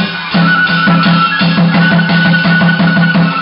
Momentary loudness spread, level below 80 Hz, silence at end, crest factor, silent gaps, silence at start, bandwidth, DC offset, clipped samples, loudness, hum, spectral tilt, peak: 1 LU; -46 dBFS; 0 s; 8 dB; none; 0 s; 5.6 kHz; under 0.1%; under 0.1%; -9 LUFS; none; -11 dB/octave; 0 dBFS